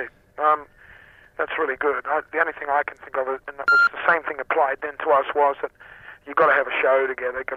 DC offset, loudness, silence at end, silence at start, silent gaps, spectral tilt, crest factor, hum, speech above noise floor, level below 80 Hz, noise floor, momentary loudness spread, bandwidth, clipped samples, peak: under 0.1%; -22 LUFS; 0 s; 0 s; none; -4.5 dB/octave; 18 dB; none; 27 dB; -62 dBFS; -49 dBFS; 11 LU; 13.5 kHz; under 0.1%; -4 dBFS